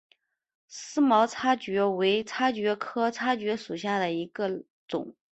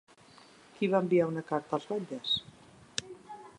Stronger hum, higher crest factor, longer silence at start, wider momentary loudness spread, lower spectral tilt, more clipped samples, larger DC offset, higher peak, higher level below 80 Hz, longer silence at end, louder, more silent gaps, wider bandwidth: neither; second, 18 dB vs 24 dB; about the same, 0.7 s vs 0.8 s; about the same, 12 LU vs 12 LU; about the same, -4.5 dB/octave vs -5 dB/octave; neither; neither; about the same, -10 dBFS vs -10 dBFS; about the same, -72 dBFS vs -70 dBFS; about the same, 0.2 s vs 0.1 s; first, -27 LUFS vs -32 LUFS; first, 4.70-4.88 s vs none; second, 8.4 kHz vs 11 kHz